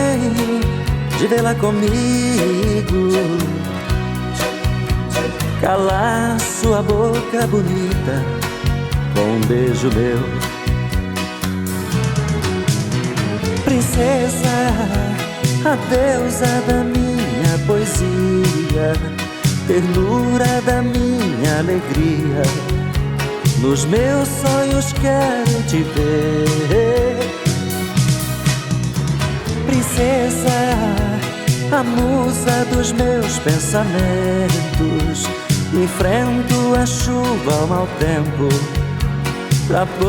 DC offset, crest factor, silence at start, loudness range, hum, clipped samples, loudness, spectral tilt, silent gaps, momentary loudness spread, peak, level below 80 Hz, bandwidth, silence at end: under 0.1%; 14 dB; 0 s; 2 LU; none; under 0.1%; -17 LUFS; -5.5 dB/octave; none; 5 LU; -2 dBFS; -30 dBFS; 18.5 kHz; 0 s